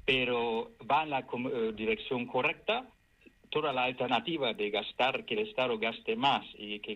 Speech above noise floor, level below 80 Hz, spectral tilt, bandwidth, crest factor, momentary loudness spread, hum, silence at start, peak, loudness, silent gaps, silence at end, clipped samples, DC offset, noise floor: 30 dB; -64 dBFS; -5.5 dB/octave; 9.2 kHz; 18 dB; 5 LU; none; 0.05 s; -14 dBFS; -32 LUFS; none; 0 s; under 0.1%; under 0.1%; -62 dBFS